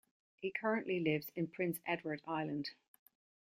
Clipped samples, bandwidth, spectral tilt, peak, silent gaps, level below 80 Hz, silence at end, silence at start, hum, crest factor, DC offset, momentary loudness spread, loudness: under 0.1%; 16 kHz; -6 dB/octave; -20 dBFS; none; -80 dBFS; 0.8 s; 0.4 s; none; 20 dB; under 0.1%; 7 LU; -39 LUFS